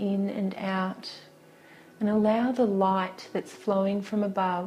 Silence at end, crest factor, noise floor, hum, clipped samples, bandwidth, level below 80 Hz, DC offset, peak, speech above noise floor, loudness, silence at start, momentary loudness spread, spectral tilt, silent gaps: 0 s; 16 dB; -53 dBFS; none; under 0.1%; 11.5 kHz; -70 dBFS; under 0.1%; -12 dBFS; 26 dB; -28 LUFS; 0 s; 11 LU; -7.5 dB/octave; none